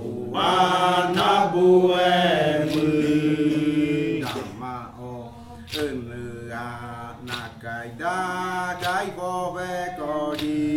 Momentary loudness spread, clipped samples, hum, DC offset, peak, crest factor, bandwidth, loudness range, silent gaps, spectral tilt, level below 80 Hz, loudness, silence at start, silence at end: 16 LU; under 0.1%; none; under 0.1%; -6 dBFS; 16 dB; 16.5 kHz; 13 LU; none; -5.5 dB/octave; -54 dBFS; -23 LUFS; 0 s; 0 s